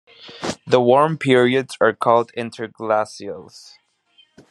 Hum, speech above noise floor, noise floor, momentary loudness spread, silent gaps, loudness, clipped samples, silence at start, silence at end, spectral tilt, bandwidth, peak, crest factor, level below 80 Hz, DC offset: none; 39 dB; -58 dBFS; 14 LU; none; -18 LUFS; under 0.1%; 0.25 s; 1.05 s; -5.5 dB/octave; 12 kHz; 0 dBFS; 20 dB; -64 dBFS; under 0.1%